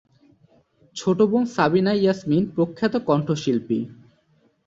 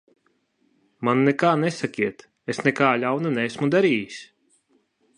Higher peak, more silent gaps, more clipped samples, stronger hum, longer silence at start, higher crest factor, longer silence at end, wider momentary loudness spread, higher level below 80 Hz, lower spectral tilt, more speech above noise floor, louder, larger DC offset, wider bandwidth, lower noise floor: about the same, -4 dBFS vs -2 dBFS; neither; neither; neither; about the same, 0.95 s vs 1 s; about the same, 18 dB vs 22 dB; second, 0.75 s vs 0.95 s; second, 8 LU vs 11 LU; first, -60 dBFS vs -70 dBFS; about the same, -7 dB/octave vs -6 dB/octave; second, 42 dB vs 46 dB; about the same, -22 LUFS vs -22 LUFS; neither; second, 7.8 kHz vs 10.5 kHz; second, -62 dBFS vs -67 dBFS